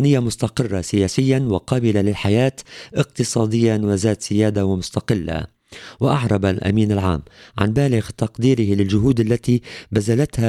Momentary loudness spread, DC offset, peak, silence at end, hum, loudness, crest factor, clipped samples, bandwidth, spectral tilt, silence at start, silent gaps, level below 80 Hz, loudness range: 6 LU; under 0.1%; -2 dBFS; 0 s; none; -19 LUFS; 16 dB; under 0.1%; 13 kHz; -6.5 dB/octave; 0 s; none; -42 dBFS; 2 LU